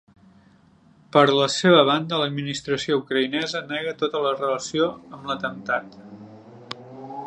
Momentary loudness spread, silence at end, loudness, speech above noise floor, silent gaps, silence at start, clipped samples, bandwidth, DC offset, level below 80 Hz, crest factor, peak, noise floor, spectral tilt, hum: 21 LU; 0 s; -22 LUFS; 33 dB; none; 1.15 s; under 0.1%; 10 kHz; under 0.1%; -64 dBFS; 22 dB; -2 dBFS; -55 dBFS; -4.5 dB/octave; none